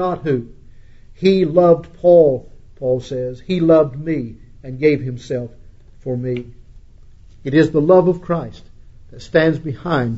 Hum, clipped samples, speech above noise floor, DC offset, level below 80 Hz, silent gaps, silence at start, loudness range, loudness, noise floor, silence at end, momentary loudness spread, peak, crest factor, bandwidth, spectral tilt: none; under 0.1%; 26 dB; under 0.1%; -42 dBFS; none; 0 s; 7 LU; -17 LUFS; -42 dBFS; 0 s; 14 LU; 0 dBFS; 16 dB; 8 kHz; -8 dB/octave